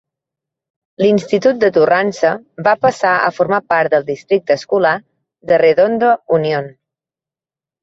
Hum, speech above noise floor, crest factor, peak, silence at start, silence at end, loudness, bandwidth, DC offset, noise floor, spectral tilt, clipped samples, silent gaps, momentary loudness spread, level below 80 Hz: none; 76 dB; 16 dB; 0 dBFS; 1 s; 1.15 s; -14 LUFS; 7.8 kHz; under 0.1%; -90 dBFS; -6 dB/octave; under 0.1%; none; 6 LU; -60 dBFS